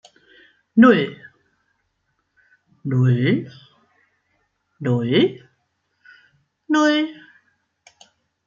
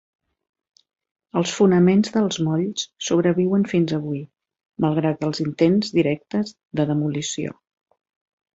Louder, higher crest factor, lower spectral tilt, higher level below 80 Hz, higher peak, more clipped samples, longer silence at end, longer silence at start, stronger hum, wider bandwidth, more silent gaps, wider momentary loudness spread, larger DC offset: about the same, -19 LUFS vs -21 LUFS; about the same, 20 dB vs 18 dB; about the same, -7 dB/octave vs -6 dB/octave; about the same, -66 dBFS vs -62 dBFS; about the same, -2 dBFS vs -4 dBFS; neither; first, 1.35 s vs 1.05 s; second, 0.75 s vs 1.35 s; neither; about the same, 7.4 kHz vs 8 kHz; second, none vs 4.66-4.70 s; first, 15 LU vs 10 LU; neither